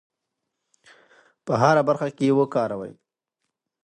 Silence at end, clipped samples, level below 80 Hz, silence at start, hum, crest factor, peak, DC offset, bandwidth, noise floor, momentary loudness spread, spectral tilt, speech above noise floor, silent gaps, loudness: 0.9 s; under 0.1%; -68 dBFS; 1.45 s; none; 22 dB; -4 dBFS; under 0.1%; 9.4 kHz; -81 dBFS; 17 LU; -7 dB/octave; 60 dB; none; -22 LUFS